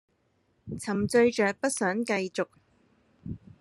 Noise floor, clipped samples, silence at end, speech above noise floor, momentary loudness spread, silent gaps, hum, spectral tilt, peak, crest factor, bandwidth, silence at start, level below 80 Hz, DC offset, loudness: -71 dBFS; under 0.1%; 0.25 s; 44 dB; 19 LU; none; none; -4.5 dB/octave; -10 dBFS; 18 dB; 13 kHz; 0.65 s; -60 dBFS; under 0.1%; -27 LUFS